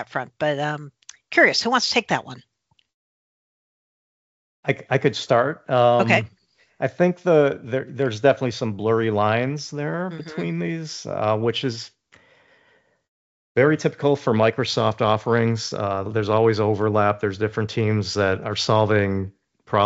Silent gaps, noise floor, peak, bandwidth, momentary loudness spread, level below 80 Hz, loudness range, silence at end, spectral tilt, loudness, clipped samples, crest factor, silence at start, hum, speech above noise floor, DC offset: 2.94-4.63 s, 13.08-13.55 s; -61 dBFS; -2 dBFS; 8 kHz; 11 LU; -64 dBFS; 6 LU; 0 s; -4.5 dB/octave; -21 LUFS; under 0.1%; 20 dB; 0 s; none; 40 dB; under 0.1%